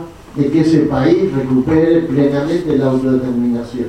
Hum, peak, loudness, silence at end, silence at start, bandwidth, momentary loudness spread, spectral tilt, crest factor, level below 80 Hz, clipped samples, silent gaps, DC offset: none; 0 dBFS; -14 LUFS; 0 s; 0 s; 9.8 kHz; 5 LU; -8.5 dB/octave; 12 dB; -40 dBFS; under 0.1%; none; under 0.1%